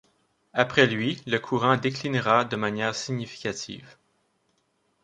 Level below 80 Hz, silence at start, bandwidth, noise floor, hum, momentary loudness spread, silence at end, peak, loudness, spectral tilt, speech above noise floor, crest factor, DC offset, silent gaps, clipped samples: -64 dBFS; 0.55 s; 10.5 kHz; -71 dBFS; none; 11 LU; 1.1 s; -2 dBFS; -25 LUFS; -5 dB/octave; 46 dB; 24 dB; under 0.1%; none; under 0.1%